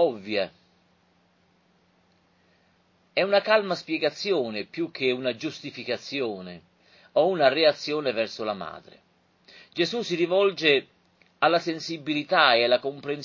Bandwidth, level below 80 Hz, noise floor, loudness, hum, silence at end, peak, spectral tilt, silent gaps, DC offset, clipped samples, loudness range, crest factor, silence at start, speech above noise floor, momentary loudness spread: 7.4 kHz; -72 dBFS; -65 dBFS; -25 LUFS; none; 0 s; -4 dBFS; -4.5 dB/octave; none; under 0.1%; under 0.1%; 6 LU; 22 dB; 0 s; 40 dB; 13 LU